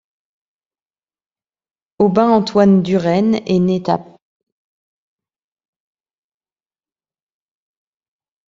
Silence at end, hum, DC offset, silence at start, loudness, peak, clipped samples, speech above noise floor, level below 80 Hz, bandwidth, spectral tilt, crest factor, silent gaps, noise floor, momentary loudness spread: 4.45 s; none; under 0.1%; 2 s; -15 LUFS; -2 dBFS; under 0.1%; over 76 dB; -58 dBFS; 7.6 kHz; -8 dB/octave; 18 dB; none; under -90 dBFS; 6 LU